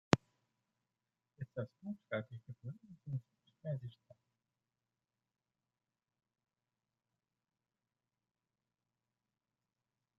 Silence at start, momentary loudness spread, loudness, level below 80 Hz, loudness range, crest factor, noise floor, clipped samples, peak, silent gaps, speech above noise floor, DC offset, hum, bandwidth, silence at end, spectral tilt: 0.1 s; 14 LU; -44 LUFS; -76 dBFS; 7 LU; 42 dB; under -90 dBFS; under 0.1%; -6 dBFS; none; over 44 dB; under 0.1%; none; 7.4 kHz; 6.25 s; -5.5 dB/octave